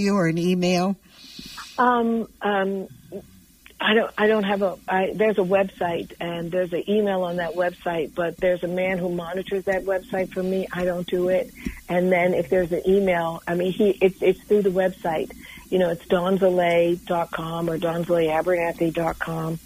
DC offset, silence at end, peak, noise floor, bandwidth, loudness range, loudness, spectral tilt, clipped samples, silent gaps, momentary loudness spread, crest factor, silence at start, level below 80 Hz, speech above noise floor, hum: under 0.1%; 0.05 s; -6 dBFS; -51 dBFS; 15.5 kHz; 3 LU; -23 LUFS; -6.5 dB/octave; under 0.1%; none; 9 LU; 18 dB; 0 s; -50 dBFS; 28 dB; none